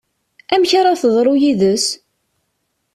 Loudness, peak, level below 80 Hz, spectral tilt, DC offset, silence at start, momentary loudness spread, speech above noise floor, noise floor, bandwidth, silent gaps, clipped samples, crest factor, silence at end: -14 LUFS; -2 dBFS; -58 dBFS; -4 dB/octave; under 0.1%; 0.5 s; 6 LU; 56 dB; -69 dBFS; 14 kHz; none; under 0.1%; 14 dB; 1 s